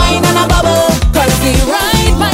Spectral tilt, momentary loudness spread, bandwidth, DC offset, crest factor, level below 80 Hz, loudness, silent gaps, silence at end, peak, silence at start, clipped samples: -4.5 dB/octave; 1 LU; 16.5 kHz; under 0.1%; 10 dB; -16 dBFS; -10 LUFS; none; 0 s; 0 dBFS; 0 s; under 0.1%